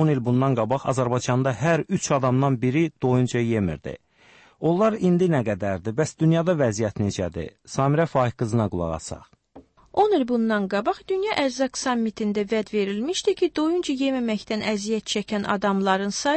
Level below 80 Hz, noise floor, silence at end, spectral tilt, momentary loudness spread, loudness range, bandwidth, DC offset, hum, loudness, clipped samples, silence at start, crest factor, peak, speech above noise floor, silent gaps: -52 dBFS; -54 dBFS; 0 s; -6 dB/octave; 6 LU; 2 LU; 8.8 kHz; under 0.1%; none; -23 LUFS; under 0.1%; 0 s; 14 dB; -8 dBFS; 31 dB; none